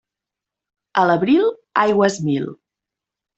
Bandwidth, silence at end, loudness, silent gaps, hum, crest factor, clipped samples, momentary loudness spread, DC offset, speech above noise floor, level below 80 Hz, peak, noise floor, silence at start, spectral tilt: 8.2 kHz; 0.85 s; -18 LUFS; none; none; 18 dB; under 0.1%; 8 LU; under 0.1%; 69 dB; -62 dBFS; -2 dBFS; -86 dBFS; 0.95 s; -6 dB/octave